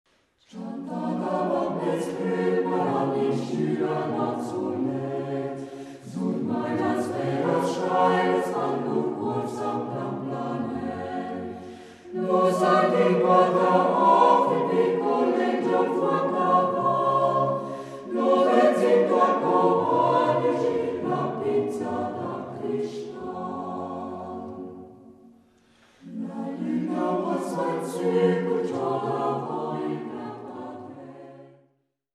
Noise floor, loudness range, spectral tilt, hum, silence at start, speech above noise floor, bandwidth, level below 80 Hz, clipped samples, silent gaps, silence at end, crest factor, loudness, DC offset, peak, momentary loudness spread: -69 dBFS; 11 LU; -7 dB/octave; none; 0.55 s; 44 dB; 13 kHz; -70 dBFS; under 0.1%; none; 0.65 s; 18 dB; -24 LUFS; under 0.1%; -6 dBFS; 16 LU